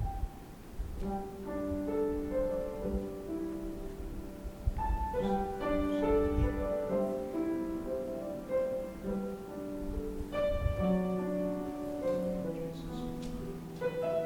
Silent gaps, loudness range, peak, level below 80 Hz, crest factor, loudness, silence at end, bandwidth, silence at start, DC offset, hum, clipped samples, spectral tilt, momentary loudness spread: none; 4 LU; -18 dBFS; -42 dBFS; 16 dB; -36 LUFS; 0 s; 20 kHz; 0 s; under 0.1%; none; under 0.1%; -8 dB/octave; 10 LU